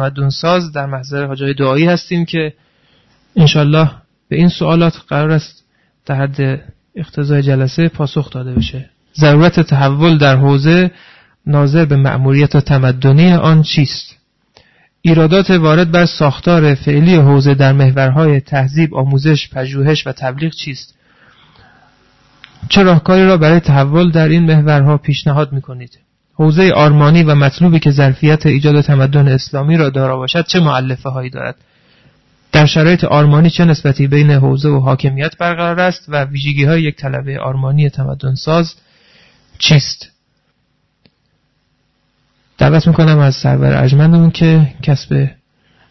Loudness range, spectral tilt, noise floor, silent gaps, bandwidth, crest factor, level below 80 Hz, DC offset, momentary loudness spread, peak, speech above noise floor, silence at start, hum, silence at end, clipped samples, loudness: 6 LU; -7.5 dB/octave; -62 dBFS; none; 6.2 kHz; 12 dB; -38 dBFS; under 0.1%; 12 LU; 0 dBFS; 51 dB; 0 s; none; 0.6 s; under 0.1%; -11 LUFS